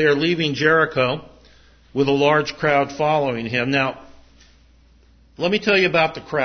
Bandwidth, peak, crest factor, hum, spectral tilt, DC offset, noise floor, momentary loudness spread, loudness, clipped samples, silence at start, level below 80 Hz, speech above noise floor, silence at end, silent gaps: 6.6 kHz; -2 dBFS; 18 dB; none; -5.5 dB/octave; under 0.1%; -52 dBFS; 6 LU; -19 LUFS; under 0.1%; 0 s; -54 dBFS; 33 dB; 0 s; none